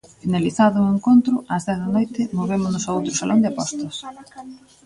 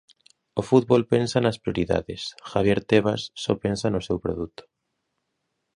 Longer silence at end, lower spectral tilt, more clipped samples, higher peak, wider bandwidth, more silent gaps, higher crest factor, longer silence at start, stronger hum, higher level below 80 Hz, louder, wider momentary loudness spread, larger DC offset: second, 0.3 s vs 1.3 s; about the same, -5.5 dB/octave vs -6 dB/octave; neither; about the same, -4 dBFS vs -4 dBFS; about the same, 11.5 kHz vs 11 kHz; neither; about the same, 16 dB vs 20 dB; second, 0.25 s vs 0.55 s; neither; second, -56 dBFS vs -48 dBFS; first, -20 LUFS vs -24 LUFS; first, 16 LU vs 12 LU; neither